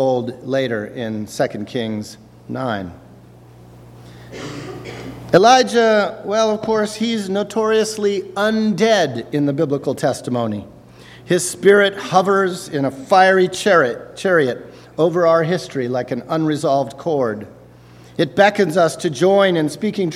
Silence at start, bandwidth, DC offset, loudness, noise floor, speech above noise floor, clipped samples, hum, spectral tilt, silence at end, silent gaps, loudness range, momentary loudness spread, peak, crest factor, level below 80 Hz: 0 s; 15 kHz; under 0.1%; -17 LUFS; -43 dBFS; 26 dB; under 0.1%; none; -5 dB/octave; 0 s; none; 9 LU; 16 LU; 0 dBFS; 18 dB; -56 dBFS